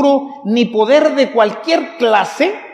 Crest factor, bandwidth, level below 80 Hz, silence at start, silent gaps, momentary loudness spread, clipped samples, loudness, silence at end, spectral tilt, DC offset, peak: 12 dB; 12 kHz; -72 dBFS; 0 s; none; 6 LU; under 0.1%; -14 LUFS; 0 s; -5 dB/octave; under 0.1%; 0 dBFS